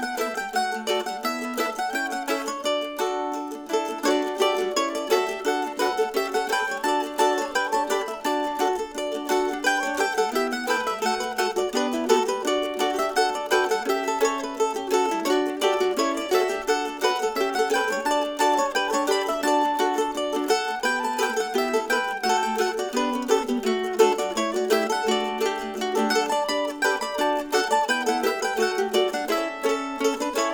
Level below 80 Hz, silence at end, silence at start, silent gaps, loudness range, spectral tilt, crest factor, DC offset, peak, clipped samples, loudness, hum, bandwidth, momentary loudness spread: -60 dBFS; 0 s; 0 s; none; 2 LU; -2 dB/octave; 18 dB; under 0.1%; -6 dBFS; under 0.1%; -24 LUFS; none; over 20 kHz; 4 LU